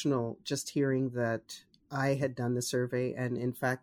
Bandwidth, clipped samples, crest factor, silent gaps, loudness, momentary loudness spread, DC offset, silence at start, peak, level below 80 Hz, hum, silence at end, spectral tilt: 19 kHz; under 0.1%; 16 dB; none; -33 LUFS; 7 LU; under 0.1%; 0 s; -16 dBFS; -70 dBFS; none; 0.05 s; -5.5 dB/octave